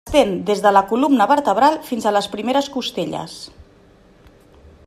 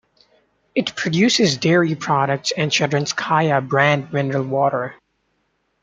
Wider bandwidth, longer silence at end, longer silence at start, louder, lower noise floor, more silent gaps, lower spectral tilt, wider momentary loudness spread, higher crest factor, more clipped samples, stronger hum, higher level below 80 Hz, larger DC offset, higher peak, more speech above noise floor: first, 15 kHz vs 9.4 kHz; first, 1.4 s vs 0.9 s; second, 0.05 s vs 0.75 s; about the same, -18 LUFS vs -18 LUFS; second, -49 dBFS vs -68 dBFS; neither; about the same, -4.5 dB/octave vs -4.5 dB/octave; first, 13 LU vs 7 LU; about the same, 18 dB vs 18 dB; neither; neither; first, -48 dBFS vs -62 dBFS; neither; about the same, -2 dBFS vs -2 dBFS; second, 32 dB vs 50 dB